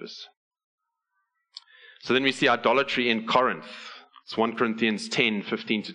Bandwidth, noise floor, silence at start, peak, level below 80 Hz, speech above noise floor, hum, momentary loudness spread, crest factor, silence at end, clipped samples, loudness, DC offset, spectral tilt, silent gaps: 11 kHz; -78 dBFS; 0 s; -4 dBFS; -72 dBFS; 53 dB; none; 19 LU; 22 dB; 0 s; under 0.1%; -24 LUFS; under 0.1%; -4 dB/octave; 0.37-0.51 s, 0.64-0.78 s